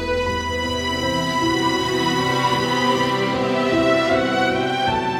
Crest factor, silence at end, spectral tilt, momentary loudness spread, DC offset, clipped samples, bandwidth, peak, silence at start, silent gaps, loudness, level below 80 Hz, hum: 14 dB; 0 s; -4.5 dB/octave; 4 LU; under 0.1%; under 0.1%; 17 kHz; -6 dBFS; 0 s; none; -19 LUFS; -44 dBFS; none